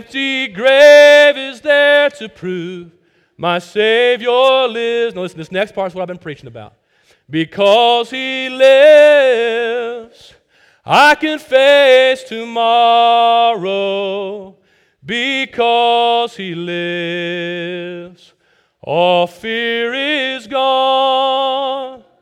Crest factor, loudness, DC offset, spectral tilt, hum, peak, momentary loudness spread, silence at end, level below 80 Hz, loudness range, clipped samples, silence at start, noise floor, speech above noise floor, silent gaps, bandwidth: 14 dB; -12 LUFS; under 0.1%; -4 dB/octave; none; 0 dBFS; 17 LU; 0.25 s; -62 dBFS; 7 LU; under 0.1%; 0.1 s; -55 dBFS; 42 dB; none; 12.5 kHz